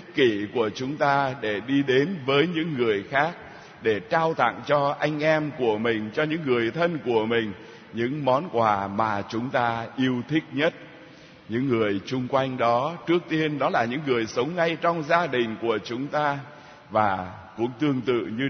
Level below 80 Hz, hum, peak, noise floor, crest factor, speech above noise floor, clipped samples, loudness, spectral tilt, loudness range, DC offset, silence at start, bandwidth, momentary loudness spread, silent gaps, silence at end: -64 dBFS; none; -6 dBFS; -48 dBFS; 20 dB; 23 dB; under 0.1%; -25 LUFS; -6.5 dB/octave; 2 LU; under 0.1%; 0 s; 6.6 kHz; 6 LU; none; 0 s